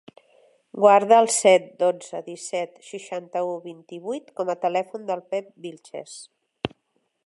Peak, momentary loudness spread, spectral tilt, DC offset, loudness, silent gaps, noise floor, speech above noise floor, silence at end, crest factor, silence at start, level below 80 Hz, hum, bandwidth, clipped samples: -2 dBFS; 22 LU; -3 dB/octave; under 0.1%; -22 LUFS; none; -72 dBFS; 50 dB; 0.6 s; 22 dB; 0.75 s; -66 dBFS; none; 11.5 kHz; under 0.1%